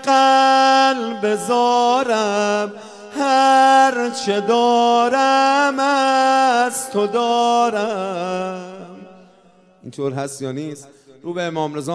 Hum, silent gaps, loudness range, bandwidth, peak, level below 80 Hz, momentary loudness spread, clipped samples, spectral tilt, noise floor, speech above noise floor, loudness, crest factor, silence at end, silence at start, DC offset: none; none; 13 LU; 11 kHz; -4 dBFS; -74 dBFS; 15 LU; under 0.1%; -3.5 dB/octave; -51 dBFS; 35 dB; -16 LUFS; 14 dB; 0 s; 0 s; under 0.1%